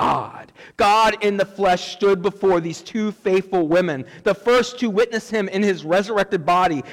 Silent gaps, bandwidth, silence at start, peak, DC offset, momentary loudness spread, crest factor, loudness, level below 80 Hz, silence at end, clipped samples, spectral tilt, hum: none; 16 kHz; 0 s; -10 dBFS; under 0.1%; 8 LU; 10 dB; -20 LUFS; -52 dBFS; 0 s; under 0.1%; -5 dB/octave; none